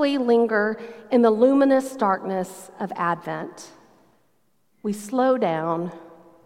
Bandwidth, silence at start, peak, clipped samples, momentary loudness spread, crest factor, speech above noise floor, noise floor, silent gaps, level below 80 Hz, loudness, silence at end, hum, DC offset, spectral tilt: 15.5 kHz; 0 s; -4 dBFS; under 0.1%; 16 LU; 18 dB; 47 dB; -69 dBFS; none; -74 dBFS; -22 LUFS; 0.4 s; none; under 0.1%; -6 dB/octave